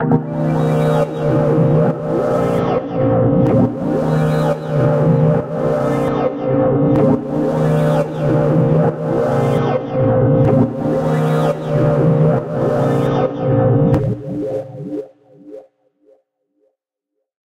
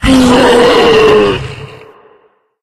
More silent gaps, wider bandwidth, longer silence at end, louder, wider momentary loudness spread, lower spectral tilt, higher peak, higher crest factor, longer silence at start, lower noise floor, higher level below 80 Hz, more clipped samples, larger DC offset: neither; second, 10.5 kHz vs 14.5 kHz; first, 1.85 s vs 0.85 s; second, -16 LUFS vs -7 LUFS; second, 5 LU vs 16 LU; first, -9.5 dB/octave vs -5 dB/octave; about the same, 0 dBFS vs 0 dBFS; first, 16 dB vs 8 dB; about the same, 0 s vs 0 s; first, -76 dBFS vs -50 dBFS; second, -40 dBFS vs -28 dBFS; second, under 0.1% vs 0.3%; neither